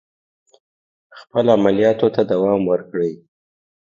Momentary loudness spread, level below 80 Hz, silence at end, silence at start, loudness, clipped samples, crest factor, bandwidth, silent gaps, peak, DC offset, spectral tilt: 9 LU; -58 dBFS; 0.8 s; 1.15 s; -18 LUFS; under 0.1%; 18 dB; 7.2 kHz; none; 0 dBFS; under 0.1%; -8 dB/octave